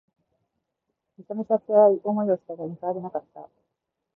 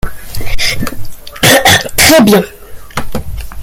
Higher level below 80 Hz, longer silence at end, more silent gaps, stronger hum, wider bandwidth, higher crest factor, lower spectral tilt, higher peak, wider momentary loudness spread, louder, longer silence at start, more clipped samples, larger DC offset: second, -78 dBFS vs -26 dBFS; first, 0.7 s vs 0 s; neither; neither; second, 2 kHz vs over 20 kHz; first, 20 dB vs 10 dB; first, -12.5 dB/octave vs -3 dB/octave; second, -6 dBFS vs 0 dBFS; about the same, 17 LU vs 19 LU; second, -24 LUFS vs -8 LUFS; first, 1.2 s vs 0.05 s; second, under 0.1% vs 0.4%; neither